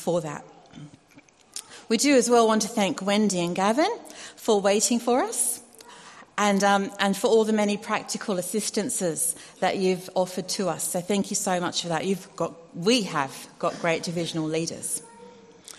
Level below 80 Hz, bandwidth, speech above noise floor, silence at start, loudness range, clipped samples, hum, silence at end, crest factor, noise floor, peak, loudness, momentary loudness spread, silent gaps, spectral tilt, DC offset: -68 dBFS; 13 kHz; 30 dB; 0 s; 4 LU; under 0.1%; none; 0.05 s; 20 dB; -55 dBFS; -4 dBFS; -25 LUFS; 12 LU; none; -3.5 dB/octave; under 0.1%